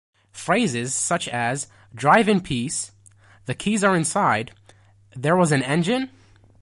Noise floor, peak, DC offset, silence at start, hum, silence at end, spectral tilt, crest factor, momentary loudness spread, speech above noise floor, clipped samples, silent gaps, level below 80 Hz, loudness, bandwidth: -53 dBFS; -2 dBFS; under 0.1%; 0.35 s; none; 0.55 s; -4.5 dB/octave; 20 dB; 16 LU; 32 dB; under 0.1%; none; -56 dBFS; -21 LUFS; 11.5 kHz